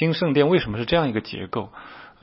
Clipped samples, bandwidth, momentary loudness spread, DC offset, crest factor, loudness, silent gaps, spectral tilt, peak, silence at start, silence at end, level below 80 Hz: under 0.1%; 5.8 kHz; 20 LU; under 0.1%; 18 dB; -22 LUFS; none; -10.5 dB/octave; -4 dBFS; 0 s; 0.15 s; -48 dBFS